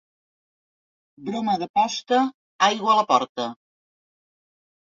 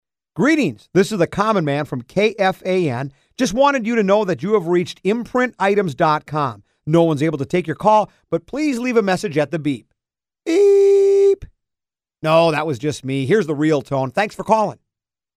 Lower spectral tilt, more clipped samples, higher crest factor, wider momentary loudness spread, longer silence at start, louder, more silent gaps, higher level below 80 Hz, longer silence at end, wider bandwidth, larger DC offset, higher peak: second, -3.5 dB/octave vs -6 dB/octave; neither; first, 22 dB vs 16 dB; first, 13 LU vs 9 LU; first, 1.2 s vs 0.35 s; second, -22 LUFS vs -18 LUFS; first, 1.69-1.74 s, 2.34-2.59 s, 3.29-3.35 s vs none; second, -70 dBFS vs -52 dBFS; first, 1.35 s vs 0.65 s; second, 7.6 kHz vs 13.5 kHz; neither; about the same, -4 dBFS vs -2 dBFS